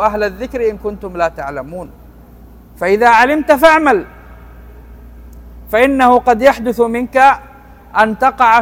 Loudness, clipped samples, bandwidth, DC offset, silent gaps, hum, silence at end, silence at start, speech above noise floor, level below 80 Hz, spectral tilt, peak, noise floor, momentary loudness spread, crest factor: -12 LUFS; 0.6%; 17 kHz; under 0.1%; none; none; 0 s; 0 s; 27 dB; -38 dBFS; -5 dB/octave; 0 dBFS; -38 dBFS; 15 LU; 14 dB